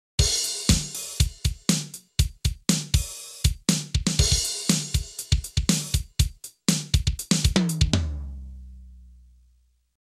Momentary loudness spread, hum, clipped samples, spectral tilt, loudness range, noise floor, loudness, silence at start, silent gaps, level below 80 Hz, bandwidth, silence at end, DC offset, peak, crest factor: 8 LU; none; under 0.1%; -3.5 dB/octave; 2 LU; -63 dBFS; -24 LUFS; 0.2 s; none; -30 dBFS; 15 kHz; 1.05 s; under 0.1%; -4 dBFS; 22 dB